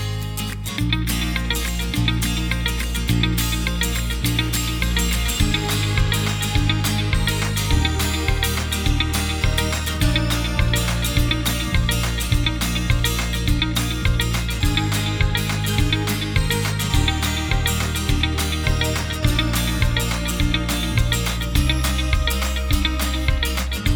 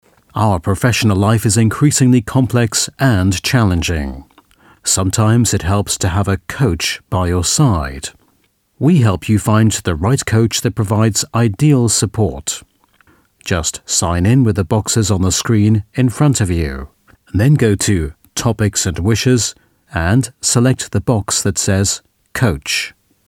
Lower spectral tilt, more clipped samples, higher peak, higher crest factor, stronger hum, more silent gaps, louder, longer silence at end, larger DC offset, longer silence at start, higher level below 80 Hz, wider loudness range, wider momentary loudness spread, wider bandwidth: about the same, -4 dB/octave vs -5 dB/octave; neither; second, -4 dBFS vs 0 dBFS; about the same, 16 dB vs 14 dB; neither; neither; second, -21 LUFS vs -15 LUFS; second, 0 s vs 0.4 s; neither; second, 0 s vs 0.35 s; first, -24 dBFS vs -34 dBFS; about the same, 1 LU vs 3 LU; second, 2 LU vs 8 LU; first, over 20 kHz vs 16.5 kHz